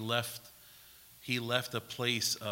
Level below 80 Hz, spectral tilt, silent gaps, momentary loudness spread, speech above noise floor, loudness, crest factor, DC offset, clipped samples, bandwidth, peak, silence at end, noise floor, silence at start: -74 dBFS; -3 dB/octave; none; 23 LU; 22 dB; -34 LUFS; 22 dB; under 0.1%; under 0.1%; 16.5 kHz; -14 dBFS; 0 s; -57 dBFS; 0 s